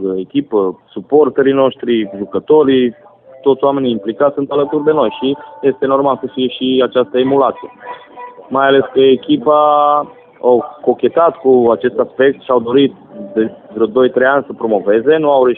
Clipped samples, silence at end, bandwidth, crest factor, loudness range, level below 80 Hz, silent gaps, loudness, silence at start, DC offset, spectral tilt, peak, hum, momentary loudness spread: under 0.1%; 0 s; 4 kHz; 12 dB; 3 LU; -56 dBFS; none; -13 LUFS; 0 s; under 0.1%; -10.5 dB/octave; 0 dBFS; none; 9 LU